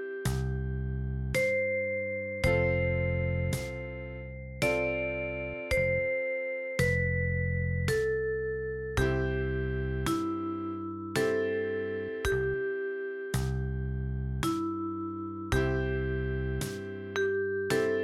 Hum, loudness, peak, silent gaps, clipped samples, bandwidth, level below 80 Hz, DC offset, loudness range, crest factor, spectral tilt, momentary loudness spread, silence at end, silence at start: none; -31 LUFS; -14 dBFS; none; under 0.1%; 15.5 kHz; -40 dBFS; under 0.1%; 3 LU; 18 dB; -6 dB/octave; 8 LU; 0 s; 0 s